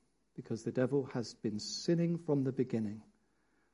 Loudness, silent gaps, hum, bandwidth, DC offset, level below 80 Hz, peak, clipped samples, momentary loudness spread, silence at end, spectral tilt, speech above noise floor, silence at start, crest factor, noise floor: -36 LUFS; none; none; 11 kHz; under 0.1%; -74 dBFS; -20 dBFS; under 0.1%; 11 LU; 0.7 s; -6.5 dB/octave; 40 dB; 0.35 s; 18 dB; -76 dBFS